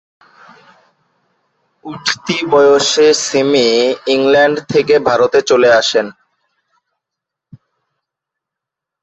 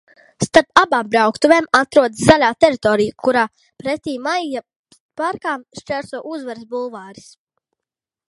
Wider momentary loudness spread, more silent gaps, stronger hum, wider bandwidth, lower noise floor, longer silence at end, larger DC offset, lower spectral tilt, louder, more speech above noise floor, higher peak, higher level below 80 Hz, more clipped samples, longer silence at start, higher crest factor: second, 8 LU vs 16 LU; second, none vs 4.76-4.84 s, 5.00-5.09 s; neither; second, 8.2 kHz vs 11.5 kHz; second, -82 dBFS vs -87 dBFS; first, 2.9 s vs 1.2 s; neither; second, -3 dB/octave vs -4.5 dB/octave; first, -12 LUFS vs -16 LUFS; about the same, 71 dB vs 70 dB; about the same, 0 dBFS vs 0 dBFS; second, -56 dBFS vs -50 dBFS; neither; first, 1.85 s vs 0.4 s; about the same, 14 dB vs 18 dB